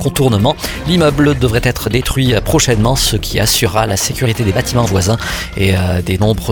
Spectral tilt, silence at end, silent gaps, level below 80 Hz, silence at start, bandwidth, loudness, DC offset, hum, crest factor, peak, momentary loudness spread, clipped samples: -4.5 dB/octave; 0 s; none; -26 dBFS; 0 s; 19.5 kHz; -13 LUFS; under 0.1%; none; 12 dB; 0 dBFS; 4 LU; under 0.1%